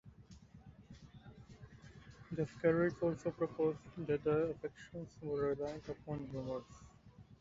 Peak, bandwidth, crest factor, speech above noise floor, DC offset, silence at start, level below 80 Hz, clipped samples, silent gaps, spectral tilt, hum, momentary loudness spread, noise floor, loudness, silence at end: -20 dBFS; 7.6 kHz; 20 dB; 22 dB; under 0.1%; 0.05 s; -64 dBFS; under 0.1%; none; -7.5 dB/octave; none; 24 LU; -61 dBFS; -39 LUFS; 0.05 s